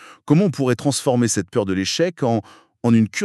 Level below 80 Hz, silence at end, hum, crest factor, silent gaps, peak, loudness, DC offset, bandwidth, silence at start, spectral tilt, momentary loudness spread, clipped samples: -60 dBFS; 0 s; none; 16 dB; none; -4 dBFS; -20 LUFS; under 0.1%; 13 kHz; 0 s; -5.5 dB/octave; 5 LU; under 0.1%